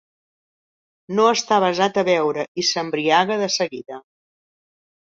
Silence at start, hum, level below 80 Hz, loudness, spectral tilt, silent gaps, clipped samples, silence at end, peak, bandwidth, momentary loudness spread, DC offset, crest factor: 1.1 s; none; -68 dBFS; -19 LUFS; -3.5 dB/octave; 2.48-2.55 s; under 0.1%; 1.05 s; -4 dBFS; 7.8 kHz; 9 LU; under 0.1%; 18 dB